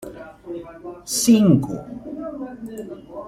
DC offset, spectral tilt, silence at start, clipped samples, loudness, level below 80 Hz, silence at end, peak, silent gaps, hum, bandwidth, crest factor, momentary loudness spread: under 0.1%; -5.5 dB/octave; 0 s; under 0.1%; -19 LUFS; -52 dBFS; 0 s; -4 dBFS; none; none; 16 kHz; 18 dB; 22 LU